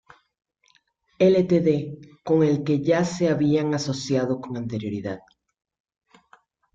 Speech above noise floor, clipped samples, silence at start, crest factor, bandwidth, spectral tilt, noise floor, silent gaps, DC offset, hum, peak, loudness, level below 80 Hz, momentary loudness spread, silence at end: 43 dB; under 0.1%; 1.2 s; 18 dB; 7.8 kHz; -7 dB/octave; -64 dBFS; none; under 0.1%; none; -6 dBFS; -23 LUFS; -60 dBFS; 12 LU; 1.55 s